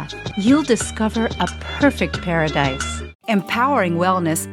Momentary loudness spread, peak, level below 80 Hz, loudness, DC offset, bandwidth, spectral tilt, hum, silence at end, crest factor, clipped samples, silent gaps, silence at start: 7 LU; -2 dBFS; -36 dBFS; -19 LUFS; under 0.1%; 17 kHz; -5 dB/octave; none; 0 s; 18 dB; under 0.1%; 3.15-3.19 s; 0 s